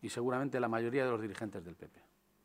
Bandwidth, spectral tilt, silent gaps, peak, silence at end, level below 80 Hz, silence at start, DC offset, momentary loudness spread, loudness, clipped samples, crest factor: 16 kHz; -6 dB/octave; none; -20 dBFS; 0.45 s; -74 dBFS; 0 s; under 0.1%; 19 LU; -36 LUFS; under 0.1%; 18 dB